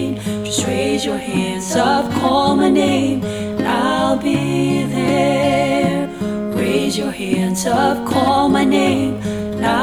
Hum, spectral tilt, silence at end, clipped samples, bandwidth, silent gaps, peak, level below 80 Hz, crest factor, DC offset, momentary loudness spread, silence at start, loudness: none; -5 dB/octave; 0 s; under 0.1%; 19 kHz; none; -2 dBFS; -46 dBFS; 14 dB; under 0.1%; 7 LU; 0 s; -17 LUFS